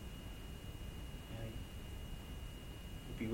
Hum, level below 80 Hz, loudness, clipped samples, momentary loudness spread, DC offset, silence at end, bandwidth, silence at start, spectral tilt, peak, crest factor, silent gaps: none; -50 dBFS; -50 LUFS; under 0.1%; 3 LU; under 0.1%; 0 s; 16.5 kHz; 0 s; -5.5 dB/octave; -26 dBFS; 20 dB; none